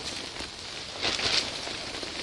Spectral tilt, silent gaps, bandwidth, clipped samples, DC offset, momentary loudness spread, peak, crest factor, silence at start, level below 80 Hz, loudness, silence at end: -1.5 dB/octave; none; 11.5 kHz; under 0.1%; under 0.1%; 11 LU; -8 dBFS; 24 dB; 0 s; -54 dBFS; -30 LUFS; 0 s